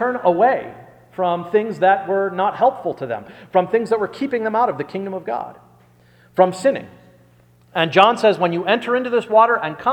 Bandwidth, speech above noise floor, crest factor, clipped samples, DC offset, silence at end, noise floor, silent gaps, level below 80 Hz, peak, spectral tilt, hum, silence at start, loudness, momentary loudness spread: 11 kHz; 34 dB; 18 dB; under 0.1%; under 0.1%; 0 s; -52 dBFS; none; -64 dBFS; 0 dBFS; -5.5 dB/octave; 60 Hz at -50 dBFS; 0 s; -18 LUFS; 13 LU